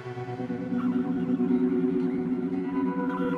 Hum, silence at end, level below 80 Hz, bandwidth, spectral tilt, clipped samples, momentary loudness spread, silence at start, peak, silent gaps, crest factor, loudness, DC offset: none; 0 s; -62 dBFS; 5 kHz; -9.5 dB/octave; under 0.1%; 8 LU; 0 s; -14 dBFS; none; 14 dB; -28 LUFS; under 0.1%